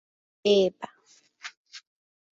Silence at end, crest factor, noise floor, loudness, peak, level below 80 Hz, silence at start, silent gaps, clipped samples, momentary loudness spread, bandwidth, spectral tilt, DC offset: 0.55 s; 20 dB; -61 dBFS; -24 LUFS; -10 dBFS; -74 dBFS; 0.45 s; 1.57-1.65 s; under 0.1%; 25 LU; 7.6 kHz; -5 dB/octave; under 0.1%